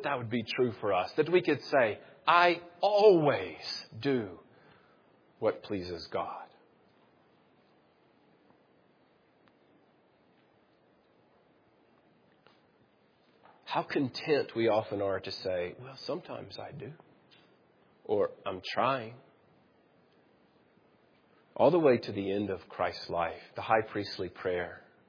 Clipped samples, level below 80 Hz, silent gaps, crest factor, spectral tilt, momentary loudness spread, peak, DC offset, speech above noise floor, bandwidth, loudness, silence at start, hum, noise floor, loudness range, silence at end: under 0.1%; -74 dBFS; none; 24 dB; -3.5 dB/octave; 16 LU; -10 dBFS; under 0.1%; 37 dB; 5.4 kHz; -31 LUFS; 0 s; none; -67 dBFS; 13 LU; 0.3 s